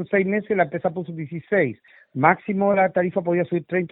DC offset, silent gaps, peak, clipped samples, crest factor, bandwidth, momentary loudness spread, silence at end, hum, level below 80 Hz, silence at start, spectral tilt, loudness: under 0.1%; none; -2 dBFS; under 0.1%; 20 dB; 4 kHz; 12 LU; 0.05 s; none; -64 dBFS; 0 s; -12 dB/octave; -22 LUFS